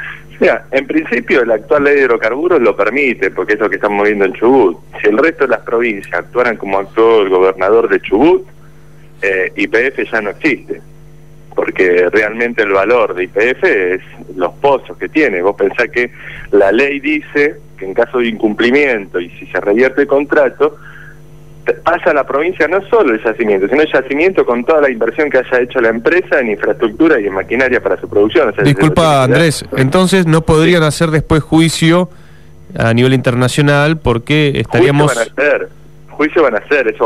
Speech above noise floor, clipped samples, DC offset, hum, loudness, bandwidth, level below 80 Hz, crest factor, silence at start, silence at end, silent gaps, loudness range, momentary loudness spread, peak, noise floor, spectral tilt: 28 dB; under 0.1%; 1%; none; -12 LUFS; 14.5 kHz; -40 dBFS; 12 dB; 0 s; 0 s; none; 3 LU; 7 LU; 0 dBFS; -40 dBFS; -6 dB/octave